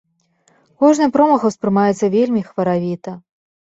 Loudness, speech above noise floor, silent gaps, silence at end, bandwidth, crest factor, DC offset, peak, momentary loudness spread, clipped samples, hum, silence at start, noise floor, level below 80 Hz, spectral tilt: -16 LUFS; 45 dB; none; 0.5 s; 8 kHz; 16 dB; under 0.1%; -2 dBFS; 13 LU; under 0.1%; none; 0.8 s; -60 dBFS; -60 dBFS; -7 dB/octave